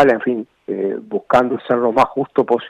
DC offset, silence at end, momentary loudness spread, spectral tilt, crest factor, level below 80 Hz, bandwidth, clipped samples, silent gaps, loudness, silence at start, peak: under 0.1%; 0 s; 10 LU; -7 dB/octave; 14 dB; -56 dBFS; 11 kHz; under 0.1%; none; -18 LUFS; 0 s; -4 dBFS